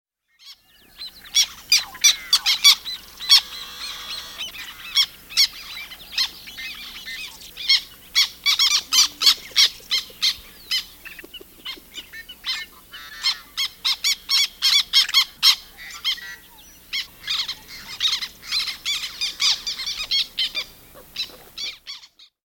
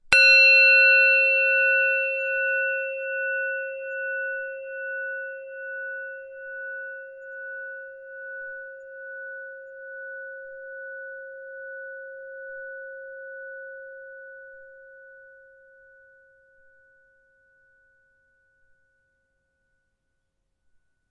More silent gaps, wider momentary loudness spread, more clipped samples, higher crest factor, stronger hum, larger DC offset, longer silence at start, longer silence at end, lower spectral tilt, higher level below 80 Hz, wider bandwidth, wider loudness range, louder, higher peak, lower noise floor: neither; second, 21 LU vs 26 LU; neither; about the same, 24 dB vs 26 dB; neither; neither; first, 0.45 s vs 0.05 s; second, 0.5 s vs 5.9 s; second, 3 dB/octave vs 0.5 dB/octave; first, -56 dBFS vs -66 dBFS; first, 17 kHz vs 11.5 kHz; second, 8 LU vs 22 LU; about the same, -19 LUFS vs -19 LUFS; about the same, 0 dBFS vs -2 dBFS; second, -49 dBFS vs -76 dBFS